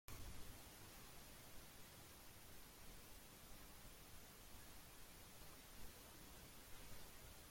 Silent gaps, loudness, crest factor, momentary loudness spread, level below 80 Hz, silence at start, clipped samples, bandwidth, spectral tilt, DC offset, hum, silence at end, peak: none; -60 LUFS; 26 dB; 2 LU; -66 dBFS; 0.1 s; under 0.1%; 16.5 kHz; -3 dB/octave; under 0.1%; none; 0 s; -32 dBFS